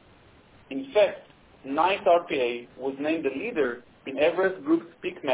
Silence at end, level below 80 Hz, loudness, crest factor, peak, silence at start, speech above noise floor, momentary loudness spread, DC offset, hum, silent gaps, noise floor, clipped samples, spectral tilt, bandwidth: 0 s; -64 dBFS; -26 LUFS; 16 dB; -10 dBFS; 0.7 s; 29 dB; 14 LU; under 0.1%; none; none; -55 dBFS; under 0.1%; -8.5 dB/octave; 4 kHz